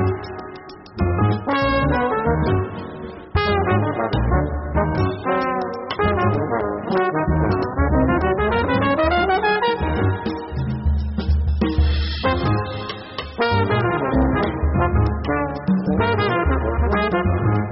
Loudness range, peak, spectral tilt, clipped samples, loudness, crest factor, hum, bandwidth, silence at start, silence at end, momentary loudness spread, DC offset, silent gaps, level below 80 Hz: 2 LU; -6 dBFS; -5.5 dB/octave; under 0.1%; -20 LUFS; 14 dB; none; 5.8 kHz; 0 s; 0 s; 8 LU; under 0.1%; none; -28 dBFS